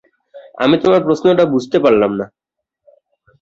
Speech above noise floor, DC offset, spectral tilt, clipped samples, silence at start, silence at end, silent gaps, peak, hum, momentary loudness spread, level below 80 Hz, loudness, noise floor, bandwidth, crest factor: 61 dB; under 0.1%; -6.5 dB/octave; under 0.1%; 0.35 s; 1.15 s; none; 0 dBFS; none; 7 LU; -56 dBFS; -14 LUFS; -73 dBFS; 7.8 kHz; 16 dB